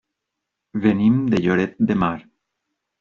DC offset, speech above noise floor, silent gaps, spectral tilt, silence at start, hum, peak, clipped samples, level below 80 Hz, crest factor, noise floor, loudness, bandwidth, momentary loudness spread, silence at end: under 0.1%; 63 dB; none; -7 dB/octave; 0.75 s; none; -4 dBFS; under 0.1%; -54 dBFS; 16 dB; -81 dBFS; -19 LUFS; 7 kHz; 9 LU; 0.8 s